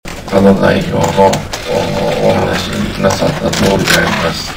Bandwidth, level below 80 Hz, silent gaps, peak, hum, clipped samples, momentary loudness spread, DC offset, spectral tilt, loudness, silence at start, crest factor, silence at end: 16.5 kHz; -30 dBFS; none; 0 dBFS; none; 0.4%; 6 LU; under 0.1%; -5 dB/octave; -12 LUFS; 0.05 s; 12 dB; 0 s